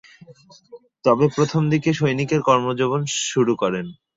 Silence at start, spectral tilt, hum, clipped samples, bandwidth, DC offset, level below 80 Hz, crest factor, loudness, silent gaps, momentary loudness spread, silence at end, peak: 0.3 s; -5.5 dB/octave; none; under 0.1%; 7.8 kHz; under 0.1%; -60 dBFS; 18 dB; -20 LUFS; none; 5 LU; 0.25 s; -4 dBFS